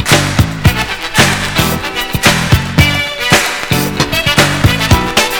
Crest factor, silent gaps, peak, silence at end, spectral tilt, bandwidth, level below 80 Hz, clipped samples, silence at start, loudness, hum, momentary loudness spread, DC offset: 12 dB; none; 0 dBFS; 0 s; -3.5 dB/octave; over 20 kHz; -24 dBFS; 0.8%; 0 s; -11 LUFS; none; 4 LU; under 0.1%